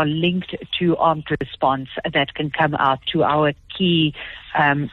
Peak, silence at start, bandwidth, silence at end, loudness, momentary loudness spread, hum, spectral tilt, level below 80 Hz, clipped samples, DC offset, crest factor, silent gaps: -4 dBFS; 0 s; 4.3 kHz; 0 s; -20 LUFS; 7 LU; none; -8.5 dB/octave; -50 dBFS; under 0.1%; under 0.1%; 16 dB; none